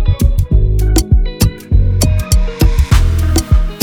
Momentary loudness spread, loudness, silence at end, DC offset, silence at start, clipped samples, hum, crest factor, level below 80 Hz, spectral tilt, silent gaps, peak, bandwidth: 3 LU; -13 LUFS; 0 s; under 0.1%; 0 s; under 0.1%; none; 10 dB; -12 dBFS; -5.5 dB/octave; none; 0 dBFS; 20 kHz